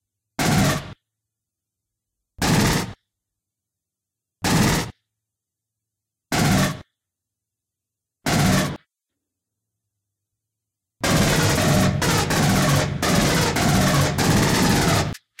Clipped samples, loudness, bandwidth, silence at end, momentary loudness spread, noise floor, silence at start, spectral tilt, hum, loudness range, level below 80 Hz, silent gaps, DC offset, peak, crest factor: under 0.1%; -20 LUFS; 17 kHz; 0.25 s; 10 LU; -85 dBFS; 0.4 s; -4.5 dB/octave; none; 8 LU; -38 dBFS; none; under 0.1%; -6 dBFS; 16 dB